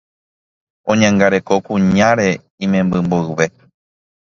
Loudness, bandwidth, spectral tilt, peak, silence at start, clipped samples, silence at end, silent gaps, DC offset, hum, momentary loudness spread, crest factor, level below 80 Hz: -15 LUFS; 7.4 kHz; -6 dB/octave; 0 dBFS; 0.85 s; under 0.1%; 0.8 s; 2.50-2.58 s; under 0.1%; none; 7 LU; 16 dB; -46 dBFS